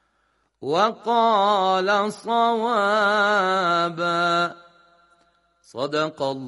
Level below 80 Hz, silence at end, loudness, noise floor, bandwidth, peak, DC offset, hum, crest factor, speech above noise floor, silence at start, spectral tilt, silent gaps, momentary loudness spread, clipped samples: -74 dBFS; 0 s; -21 LUFS; -68 dBFS; 11.5 kHz; -6 dBFS; under 0.1%; none; 16 dB; 47 dB; 0.6 s; -4.5 dB/octave; none; 7 LU; under 0.1%